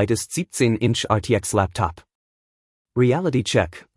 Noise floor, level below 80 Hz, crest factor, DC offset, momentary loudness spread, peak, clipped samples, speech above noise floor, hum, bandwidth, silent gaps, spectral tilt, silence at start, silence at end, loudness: under -90 dBFS; -48 dBFS; 18 dB; under 0.1%; 7 LU; -4 dBFS; under 0.1%; over 69 dB; none; 12 kHz; 2.15-2.85 s; -5 dB/octave; 0 s; 0.15 s; -21 LUFS